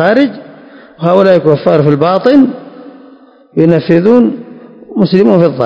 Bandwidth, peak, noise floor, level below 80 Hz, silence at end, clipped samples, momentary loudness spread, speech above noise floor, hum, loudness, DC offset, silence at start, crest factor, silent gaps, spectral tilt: 8 kHz; 0 dBFS; -39 dBFS; -52 dBFS; 0 s; 2%; 12 LU; 32 dB; none; -9 LUFS; under 0.1%; 0 s; 10 dB; none; -9 dB/octave